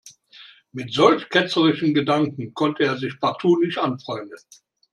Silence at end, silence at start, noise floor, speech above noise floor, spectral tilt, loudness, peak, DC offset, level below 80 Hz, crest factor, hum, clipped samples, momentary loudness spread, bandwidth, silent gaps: 0.55 s; 0.05 s; -48 dBFS; 27 dB; -6 dB/octave; -21 LUFS; -2 dBFS; under 0.1%; -66 dBFS; 20 dB; none; under 0.1%; 15 LU; 11 kHz; none